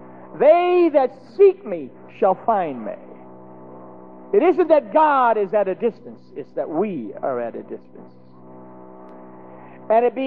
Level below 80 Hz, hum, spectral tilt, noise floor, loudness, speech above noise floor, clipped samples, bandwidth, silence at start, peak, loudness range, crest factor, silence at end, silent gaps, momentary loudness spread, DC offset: -72 dBFS; none; -9 dB/octave; -43 dBFS; -19 LUFS; 24 dB; under 0.1%; 4.9 kHz; 0 s; -4 dBFS; 11 LU; 16 dB; 0 s; none; 22 LU; 0.4%